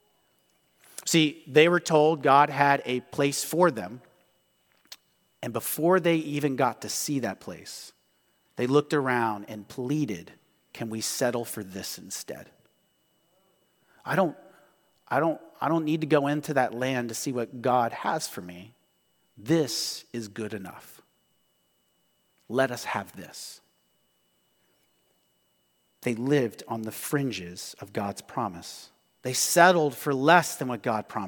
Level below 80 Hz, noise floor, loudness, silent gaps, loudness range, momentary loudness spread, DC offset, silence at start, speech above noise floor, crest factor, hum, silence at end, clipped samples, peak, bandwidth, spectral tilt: -74 dBFS; -70 dBFS; -26 LUFS; none; 11 LU; 20 LU; under 0.1%; 1 s; 44 dB; 26 dB; none; 0 s; under 0.1%; -2 dBFS; 19 kHz; -4.5 dB/octave